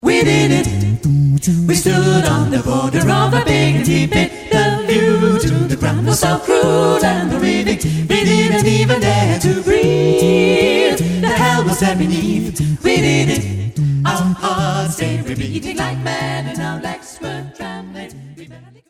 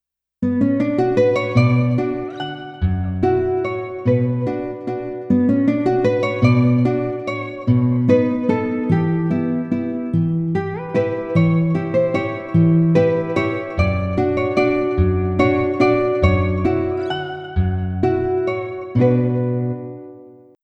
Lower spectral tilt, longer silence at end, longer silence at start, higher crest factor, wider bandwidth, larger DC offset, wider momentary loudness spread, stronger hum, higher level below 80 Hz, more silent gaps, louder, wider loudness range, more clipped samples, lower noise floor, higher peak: second, -5.5 dB/octave vs -9 dB/octave; about the same, 0.35 s vs 0.3 s; second, 0.05 s vs 0.4 s; about the same, 14 dB vs 16 dB; first, 16 kHz vs 7.8 kHz; neither; about the same, 10 LU vs 9 LU; neither; about the same, -36 dBFS vs -38 dBFS; neither; first, -15 LUFS vs -19 LUFS; first, 7 LU vs 3 LU; neither; second, -39 dBFS vs -43 dBFS; about the same, -2 dBFS vs -2 dBFS